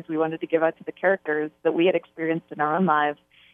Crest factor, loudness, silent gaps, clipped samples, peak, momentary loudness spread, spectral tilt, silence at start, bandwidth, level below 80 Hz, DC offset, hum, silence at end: 18 dB; -24 LUFS; none; under 0.1%; -6 dBFS; 7 LU; -9 dB/octave; 0.1 s; 3.8 kHz; -76 dBFS; under 0.1%; none; 0.4 s